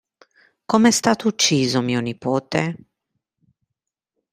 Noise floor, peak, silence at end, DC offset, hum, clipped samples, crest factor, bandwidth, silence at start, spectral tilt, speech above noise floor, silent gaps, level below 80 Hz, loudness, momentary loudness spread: -83 dBFS; 0 dBFS; 1.55 s; under 0.1%; none; under 0.1%; 22 dB; 16 kHz; 0.7 s; -4 dB/octave; 64 dB; none; -62 dBFS; -19 LUFS; 8 LU